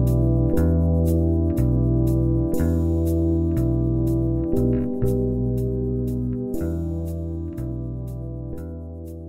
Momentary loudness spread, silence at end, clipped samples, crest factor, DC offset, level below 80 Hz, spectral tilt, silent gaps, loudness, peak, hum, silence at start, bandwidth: 11 LU; 0 s; under 0.1%; 14 dB; under 0.1%; -28 dBFS; -10.5 dB/octave; none; -23 LUFS; -8 dBFS; none; 0 s; 16 kHz